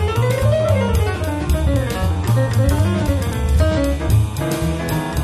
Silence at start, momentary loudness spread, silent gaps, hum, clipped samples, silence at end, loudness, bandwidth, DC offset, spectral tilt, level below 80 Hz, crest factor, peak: 0 s; 4 LU; none; none; under 0.1%; 0 s; -18 LUFS; 14 kHz; under 0.1%; -6.5 dB/octave; -22 dBFS; 14 dB; -4 dBFS